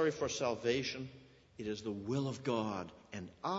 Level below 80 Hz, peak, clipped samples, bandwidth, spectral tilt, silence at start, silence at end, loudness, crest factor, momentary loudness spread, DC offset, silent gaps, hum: -68 dBFS; -22 dBFS; under 0.1%; 7.6 kHz; -4.5 dB/octave; 0 s; 0 s; -38 LUFS; 16 dB; 13 LU; under 0.1%; none; none